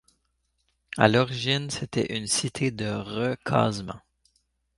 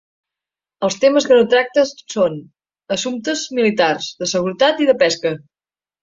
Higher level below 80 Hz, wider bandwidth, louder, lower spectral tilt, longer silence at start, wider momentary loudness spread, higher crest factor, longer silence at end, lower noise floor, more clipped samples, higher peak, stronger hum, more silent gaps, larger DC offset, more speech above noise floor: about the same, -56 dBFS vs -60 dBFS; first, 11.5 kHz vs 7.8 kHz; second, -26 LUFS vs -17 LUFS; about the same, -4.5 dB/octave vs -3.5 dB/octave; about the same, 0.9 s vs 0.8 s; first, 13 LU vs 10 LU; first, 26 dB vs 16 dB; first, 0.8 s vs 0.65 s; second, -74 dBFS vs under -90 dBFS; neither; about the same, -2 dBFS vs -2 dBFS; neither; neither; neither; second, 48 dB vs over 74 dB